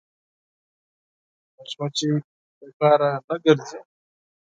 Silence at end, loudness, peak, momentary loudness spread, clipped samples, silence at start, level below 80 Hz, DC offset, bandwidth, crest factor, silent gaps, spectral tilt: 0.7 s; -22 LUFS; -2 dBFS; 19 LU; under 0.1%; 1.6 s; -76 dBFS; under 0.1%; 9.4 kHz; 24 dB; 2.24-2.61 s, 2.74-2.80 s, 3.24-3.28 s; -5.5 dB/octave